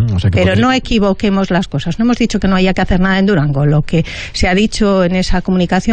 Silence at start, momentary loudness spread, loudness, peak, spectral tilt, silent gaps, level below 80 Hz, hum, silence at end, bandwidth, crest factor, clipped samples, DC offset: 0 s; 4 LU; -13 LUFS; -2 dBFS; -6.5 dB/octave; none; -26 dBFS; none; 0 s; 9.2 kHz; 10 dB; under 0.1%; under 0.1%